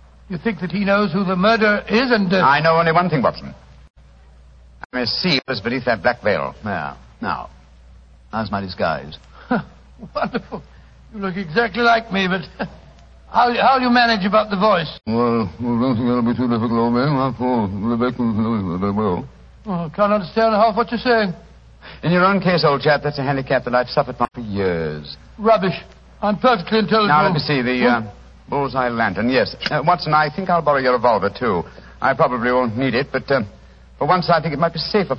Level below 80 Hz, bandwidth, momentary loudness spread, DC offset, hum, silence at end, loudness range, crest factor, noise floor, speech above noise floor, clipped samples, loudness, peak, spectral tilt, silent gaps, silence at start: -46 dBFS; 6.8 kHz; 12 LU; under 0.1%; none; 0 s; 6 LU; 16 dB; -46 dBFS; 28 dB; under 0.1%; -18 LUFS; -2 dBFS; -7.5 dB/octave; 3.90-3.94 s, 4.85-4.90 s; 0.3 s